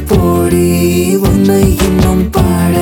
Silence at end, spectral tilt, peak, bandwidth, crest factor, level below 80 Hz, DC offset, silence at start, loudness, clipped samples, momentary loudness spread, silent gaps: 0 s; -6.5 dB/octave; 0 dBFS; 19 kHz; 10 dB; -20 dBFS; under 0.1%; 0 s; -10 LUFS; under 0.1%; 2 LU; none